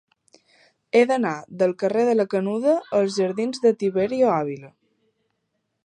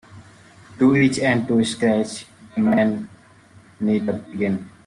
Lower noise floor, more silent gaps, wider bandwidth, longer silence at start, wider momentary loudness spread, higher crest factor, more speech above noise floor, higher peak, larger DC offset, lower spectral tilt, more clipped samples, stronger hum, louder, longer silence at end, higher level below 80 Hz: first, -75 dBFS vs -49 dBFS; neither; about the same, 10 kHz vs 11 kHz; first, 0.95 s vs 0.1 s; second, 5 LU vs 13 LU; about the same, 18 dB vs 16 dB; first, 54 dB vs 30 dB; about the same, -4 dBFS vs -6 dBFS; neither; about the same, -6 dB/octave vs -6 dB/octave; neither; neither; about the same, -22 LUFS vs -20 LUFS; first, 1.2 s vs 0.2 s; second, -68 dBFS vs -58 dBFS